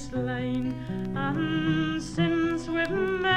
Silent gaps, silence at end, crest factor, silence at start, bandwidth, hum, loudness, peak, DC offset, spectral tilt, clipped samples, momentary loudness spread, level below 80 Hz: none; 0 s; 16 dB; 0 s; 10 kHz; none; -28 LUFS; -10 dBFS; under 0.1%; -6 dB/octave; under 0.1%; 5 LU; -48 dBFS